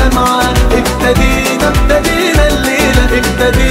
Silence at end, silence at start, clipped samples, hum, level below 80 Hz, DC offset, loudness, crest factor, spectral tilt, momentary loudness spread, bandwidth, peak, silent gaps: 0 s; 0 s; under 0.1%; none; -14 dBFS; under 0.1%; -10 LUFS; 10 dB; -4.5 dB/octave; 1 LU; 16.5 kHz; 0 dBFS; none